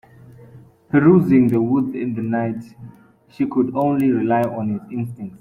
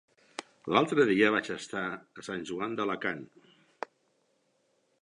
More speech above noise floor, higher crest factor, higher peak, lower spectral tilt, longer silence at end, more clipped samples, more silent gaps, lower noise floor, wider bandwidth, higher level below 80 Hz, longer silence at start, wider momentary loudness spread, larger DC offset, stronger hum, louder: second, 27 dB vs 43 dB; second, 18 dB vs 24 dB; first, -2 dBFS vs -8 dBFS; first, -10 dB/octave vs -5 dB/octave; second, 0.05 s vs 1.8 s; neither; neither; second, -45 dBFS vs -73 dBFS; first, 15 kHz vs 11 kHz; first, -56 dBFS vs -72 dBFS; about the same, 0.3 s vs 0.4 s; second, 14 LU vs 20 LU; neither; neither; first, -19 LUFS vs -29 LUFS